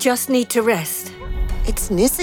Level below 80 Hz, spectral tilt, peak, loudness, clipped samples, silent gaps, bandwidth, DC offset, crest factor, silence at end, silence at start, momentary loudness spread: -26 dBFS; -4 dB/octave; -4 dBFS; -20 LUFS; under 0.1%; none; 18.5 kHz; under 0.1%; 14 dB; 0 s; 0 s; 10 LU